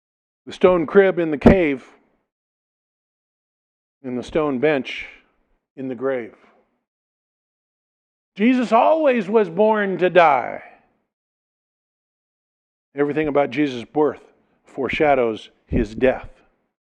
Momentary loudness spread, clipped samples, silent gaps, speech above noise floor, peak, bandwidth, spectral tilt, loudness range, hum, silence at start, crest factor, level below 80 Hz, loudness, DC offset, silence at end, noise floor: 17 LU; under 0.1%; 2.32-4.01 s, 5.70-5.76 s, 6.88-8.32 s, 11.13-12.92 s; 46 dB; 0 dBFS; 9.2 kHz; -7.5 dB/octave; 9 LU; none; 0.45 s; 22 dB; -42 dBFS; -19 LUFS; under 0.1%; 0.6 s; -65 dBFS